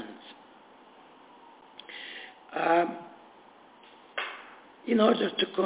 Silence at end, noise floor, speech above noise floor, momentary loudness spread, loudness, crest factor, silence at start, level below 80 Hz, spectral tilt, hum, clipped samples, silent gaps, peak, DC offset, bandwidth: 0 s; -55 dBFS; 30 dB; 25 LU; -29 LUFS; 24 dB; 0 s; -78 dBFS; -2.5 dB/octave; none; under 0.1%; none; -8 dBFS; under 0.1%; 4 kHz